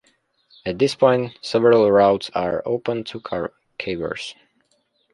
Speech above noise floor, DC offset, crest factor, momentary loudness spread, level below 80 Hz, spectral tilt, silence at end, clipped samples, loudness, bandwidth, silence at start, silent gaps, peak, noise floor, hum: 47 dB; under 0.1%; 18 dB; 16 LU; -54 dBFS; -6 dB/octave; 0.8 s; under 0.1%; -20 LUFS; 11.5 kHz; 0.65 s; none; -2 dBFS; -66 dBFS; none